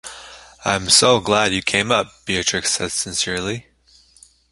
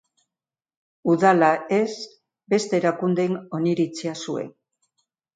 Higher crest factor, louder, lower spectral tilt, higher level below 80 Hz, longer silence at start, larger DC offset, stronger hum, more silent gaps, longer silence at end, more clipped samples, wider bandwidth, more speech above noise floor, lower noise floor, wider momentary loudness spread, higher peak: about the same, 20 dB vs 18 dB; first, -18 LUFS vs -22 LUFS; second, -2 dB/octave vs -6 dB/octave; first, -48 dBFS vs -74 dBFS; second, 0.05 s vs 1.05 s; neither; neither; neither; about the same, 0.9 s vs 0.85 s; neither; first, 11.5 kHz vs 9.4 kHz; second, 34 dB vs over 69 dB; second, -53 dBFS vs under -90 dBFS; about the same, 14 LU vs 13 LU; first, 0 dBFS vs -4 dBFS